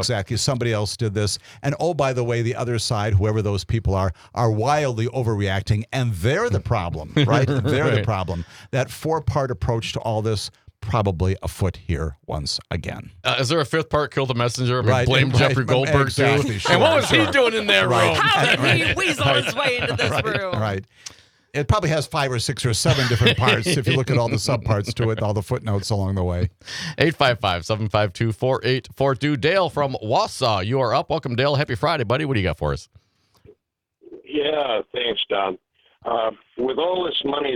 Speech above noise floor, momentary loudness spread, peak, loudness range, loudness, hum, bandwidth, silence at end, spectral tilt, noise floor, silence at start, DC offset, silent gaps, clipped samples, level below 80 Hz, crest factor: 49 dB; 10 LU; -2 dBFS; 7 LU; -21 LUFS; none; 15.5 kHz; 0 s; -5 dB/octave; -69 dBFS; 0 s; under 0.1%; none; under 0.1%; -44 dBFS; 20 dB